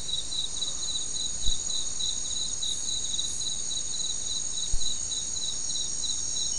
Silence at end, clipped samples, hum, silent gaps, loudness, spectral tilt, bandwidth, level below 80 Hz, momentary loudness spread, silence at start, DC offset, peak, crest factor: 0 s; under 0.1%; none; none; -28 LUFS; 0.5 dB/octave; 12 kHz; -42 dBFS; 2 LU; 0 s; 2%; -10 dBFS; 18 dB